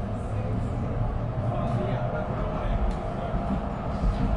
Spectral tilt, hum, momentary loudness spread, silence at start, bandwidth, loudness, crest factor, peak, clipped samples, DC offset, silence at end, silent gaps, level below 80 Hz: -9 dB/octave; none; 3 LU; 0 s; 10.5 kHz; -29 LUFS; 14 dB; -14 dBFS; under 0.1%; under 0.1%; 0 s; none; -32 dBFS